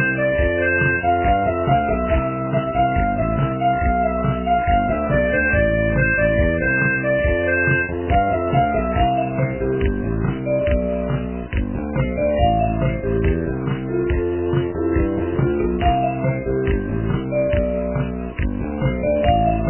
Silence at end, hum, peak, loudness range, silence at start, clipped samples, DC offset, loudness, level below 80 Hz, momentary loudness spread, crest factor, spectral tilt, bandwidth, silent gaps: 0 s; none; -4 dBFS; 3 LU; 0 s; under 0.1%; under 0.1%; -20 LUFS; -28 dBFS; 6 LU; 16 dB; -11 dB/octave; 3.2 kHz; none